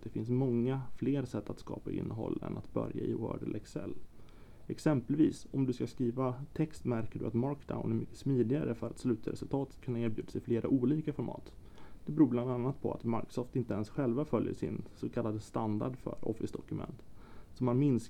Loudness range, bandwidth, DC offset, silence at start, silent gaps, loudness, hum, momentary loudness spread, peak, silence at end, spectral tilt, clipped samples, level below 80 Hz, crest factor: 4 LU; 13.5 kHz; 0.2%; 0 s; none; -35 LUFS; none; 11 LU; -14 dBFS; 0 s; -8.5 dB/octave; under 0.1%; -58 dBFS; 20 dB